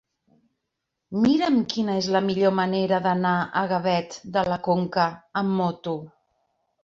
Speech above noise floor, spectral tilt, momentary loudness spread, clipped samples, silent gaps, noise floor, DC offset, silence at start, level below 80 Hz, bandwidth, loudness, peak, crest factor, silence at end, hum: 58 dB; -6.5 dB/octave; 7 LU; under 0.1%; none; -81 dBFS; under 0.1%; 1.1 s; -62 dBFS; 7.6 kHz; -24 LUFS; -8 dBFS; 16 dB; 0.75 s; none